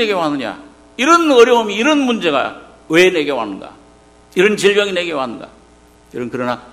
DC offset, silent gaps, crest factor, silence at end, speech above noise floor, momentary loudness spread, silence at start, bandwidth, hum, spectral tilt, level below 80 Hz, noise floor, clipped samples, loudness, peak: under 0.1%; none; 16 dB; 0.1 s; 32 dB; 17 LU; 0 s; 15 kHz; none; -4 dB/octave; -54 dBFS; -47 dBFS; under 0.1%; -14 LUFS; 0 dBFS